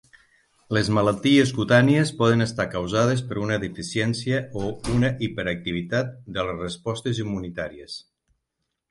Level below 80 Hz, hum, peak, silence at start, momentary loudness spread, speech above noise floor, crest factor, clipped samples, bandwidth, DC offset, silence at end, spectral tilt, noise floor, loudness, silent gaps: -48 dBFS; none; -6 dBFS; 0.7 s; 12 LU; 57 dB; 18 dB; under 0.1%; 11.5 kHz; under 0.1%; 0.9 s; -6 dB/octave; -80 dBFS; -23 LUFS; none